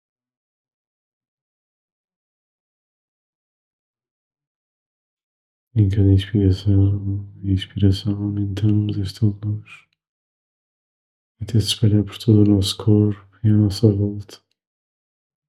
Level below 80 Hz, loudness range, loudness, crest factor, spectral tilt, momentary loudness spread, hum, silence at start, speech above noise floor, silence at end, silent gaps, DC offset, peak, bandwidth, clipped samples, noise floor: -54 dBFS; 7 LU; -19 LUFS; 20 dB; -7.5 dB/octave; 10 LU; none; 5.75 s; over 72 dB; 1.15 s; 10.09-11.35 s; 0.1%; -2 dBFS; 12.5 kHz; under 0.1%; under -90 dBFS